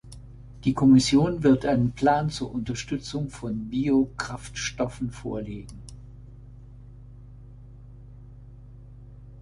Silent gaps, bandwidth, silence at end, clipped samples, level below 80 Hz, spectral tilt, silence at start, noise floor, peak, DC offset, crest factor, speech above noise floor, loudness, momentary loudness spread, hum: none; 11.5 kHz; 0 s; under 0.1%; -46 dBFS; -6 dB/octave; 0.05 s; -45 dBFS; -8 dBFS; under 0.1%; 18 dB; 21 dB; -25 LUFS; 26 LU; 50 Hz at -45 dBFS